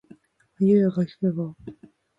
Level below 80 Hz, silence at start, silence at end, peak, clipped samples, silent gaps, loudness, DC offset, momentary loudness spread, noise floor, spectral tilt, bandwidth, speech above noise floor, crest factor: -64 dBFS; 0.6 s; 0.45 s; -8 dBFS; under 0.1%; none; -23 LUFS; under 0.1%; 21 LU; -53 dBFS; -10.5 dB/octave; 5.2 kHz; 31 dB; 16 dB